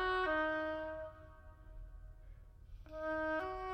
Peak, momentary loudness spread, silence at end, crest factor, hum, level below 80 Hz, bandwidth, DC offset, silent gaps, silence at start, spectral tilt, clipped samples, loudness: -24 dBFS; 25 LU; 0 s; 16 dB; none; -56 dBFS; 9 kHz; under 0.1%; none; 0 s; -6 dB/octave; under 0.1%; -39 LUFS